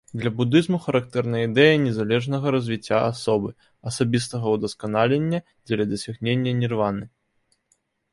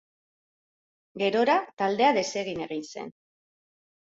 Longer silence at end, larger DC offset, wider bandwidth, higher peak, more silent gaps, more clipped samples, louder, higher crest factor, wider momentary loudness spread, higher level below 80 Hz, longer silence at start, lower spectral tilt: about the same, 1.05 s vs 1.05 s; neither; first, 11.5 kHz vs 7.8 kHz; first, -4 dBFS vs -8 dBFS; second, none vs 1.73-1.77 s; neither; first, -23 LUFS vs -26 LUFS; about the same, 18 dB vs 20 dB; second, 9 LU vs 17 LU; first, -58 dBFS vs -70 dBFS; second, 0.15 s vs 1.15 s; first, -6 dB/octave vs -4 dB/octave